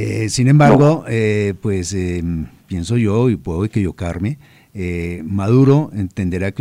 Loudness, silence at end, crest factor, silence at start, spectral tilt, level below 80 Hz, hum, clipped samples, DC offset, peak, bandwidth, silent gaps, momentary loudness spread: -17 LUFS; 0 s; 14 dB; 0 s; -7 dB/octave; -42 dBFS; none; under 0.1%; under 0.1%; -2 dBFS; 11.5 kHz; none; 13 LU